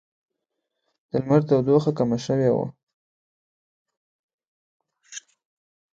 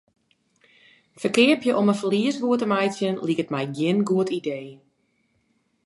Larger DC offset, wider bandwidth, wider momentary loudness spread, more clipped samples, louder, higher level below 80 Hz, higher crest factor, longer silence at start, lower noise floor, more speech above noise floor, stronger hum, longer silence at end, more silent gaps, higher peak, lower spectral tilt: neither; second, 7.8 kHz vs 11.5 kHz; first, 20 LU vs 11 LU; neither; about the same, -22 LUFS vs -23 LUFS; first, -62 dBFS vs -72 dBFS; about the same, 20 dB vs 20 dB; about the same, 1.15 s vs 1.2 s; first, -82 dBFS vs -68 dBFS; first, 61 dB vs 46 dB; neither; second, 0.75 s vs 1.1 s; first, 2.83-2.87 s, 2.94-3.85 s, 3.97-4.38 s, 4.47-4.80 s vs none; about the same, -6 dBFS vs -4 dBFS; first, -7.5 dB/octave vs -5.5 dB/octave